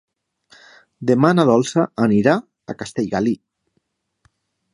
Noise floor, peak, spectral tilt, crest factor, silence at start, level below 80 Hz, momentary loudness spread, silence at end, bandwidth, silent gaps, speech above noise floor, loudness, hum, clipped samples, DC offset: -70 dBFS; 0 dBFS; -6.5 dB/octave; 20 dB; 1 s; -58 dBFS; 14 LU; 1.4 s; 11 kHz; none; 53 dB; -18 LUFS; none; under 0.1%; under 0.1%